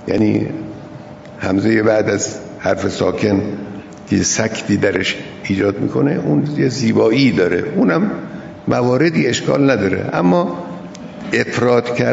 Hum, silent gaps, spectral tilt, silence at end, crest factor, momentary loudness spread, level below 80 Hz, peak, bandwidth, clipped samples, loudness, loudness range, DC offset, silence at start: none; none; -5.5 dB/octave; 0 s; 16 dB; 15 LU; -50 dBFS; 0 dBFS; 8 kHz; under 0.1%; -16 LUFS; 3 LU; under 0.1%; 0 s